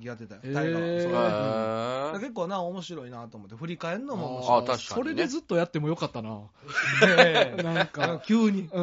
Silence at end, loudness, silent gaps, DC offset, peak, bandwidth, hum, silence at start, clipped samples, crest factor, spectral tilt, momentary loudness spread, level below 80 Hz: 0 s; -26 LUFS; none; under 0.1%; -2 dBFS; 8 kHz; none; 0 s; under 0.1%; 26 dB; -3.5 dB/octave; 19 LU; -68 dBFS